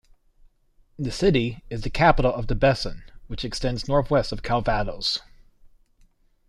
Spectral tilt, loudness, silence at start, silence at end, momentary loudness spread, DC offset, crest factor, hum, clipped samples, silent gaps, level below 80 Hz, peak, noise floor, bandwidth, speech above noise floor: -5.5 dB/octave; -24 LUFS; 1 s; 0.8 s; 13 LU; under 0.1%; 20 dB; none; under 0.1%; none; -36 dBFS; -4 dBFS; -59 dBFS; 12 kHz; 37 dB